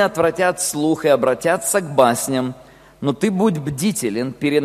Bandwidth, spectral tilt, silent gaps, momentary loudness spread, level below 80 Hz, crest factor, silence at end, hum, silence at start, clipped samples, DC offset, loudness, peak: 14.5 kHz; -4.5 dB/octave; none; 7 LU; -54 dBFS; 18 dB; 0 s; none; 0 s; under 0.1%; under 0.1%; -19 LUFS; 0 dBFS